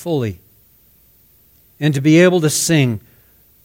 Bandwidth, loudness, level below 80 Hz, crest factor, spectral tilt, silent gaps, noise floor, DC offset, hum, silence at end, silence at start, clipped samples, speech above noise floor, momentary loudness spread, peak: 17 kHz; -15 LUFS; -54 dBFS; 18 dB; -5 dB/octave; none; -52 dBFS; under 0.1%; none; 0.65 s; 0 s; under 0.1%; 38 dB; 12 LU; 0 dBFS